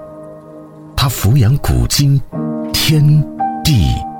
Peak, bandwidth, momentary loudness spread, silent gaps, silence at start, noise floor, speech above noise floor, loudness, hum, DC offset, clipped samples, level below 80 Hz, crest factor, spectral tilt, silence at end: -2 dBFS; 19.5 kHz; 12 LU; none; 0 s; -34 dBFS; 23 dB; -14 LUFS; none; under 0.1%; under 0.1%; -26 dBFS; 12 dB; -5 dB/octave; 0 s